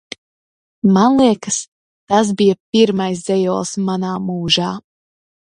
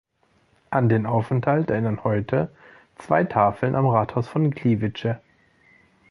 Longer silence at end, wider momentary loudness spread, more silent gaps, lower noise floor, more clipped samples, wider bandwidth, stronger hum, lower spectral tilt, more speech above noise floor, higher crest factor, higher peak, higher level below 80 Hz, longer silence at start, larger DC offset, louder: second, 0.8 s vs 0.95 s; first, 11 LU vs 6 LU; first, 1.68-2.07 s, 2.60-2.72 s vs none; first, under -90 dBFS vs -63 dBFS; neither; about the same, 11 kHz vs 10.5 kHz; neither; second, -5 dB/octave vs -9.5 dB/octave; first, over 75 dB vs 42 dB; about the same, 18 dB vs 20 dB; first, 0 dBFS vs -4 dBFS; about the same, -54 dBFS vs -54 dBFS; first, 0.85 s vs 0.7 s; neither; first, -16 LUFS vs -23 LUFS